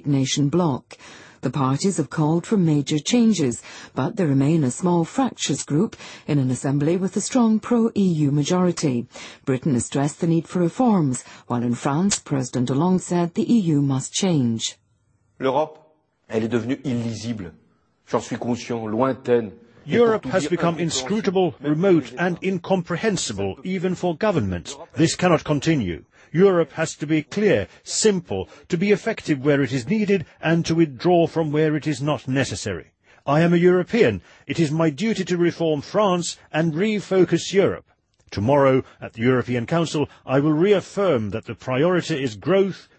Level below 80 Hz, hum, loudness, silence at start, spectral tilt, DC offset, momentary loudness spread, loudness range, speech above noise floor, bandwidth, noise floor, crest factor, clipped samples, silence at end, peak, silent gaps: -56 dBFS; none; -21 LUFS; 0.05 s; -5.5 dB/octave; under 0.1%; 9 LU; 3 LU; 43 dB; 8.8 kHz; -64 dBFS; 16 dB; under 0.1%; 0.15 s; -4 dBFS; none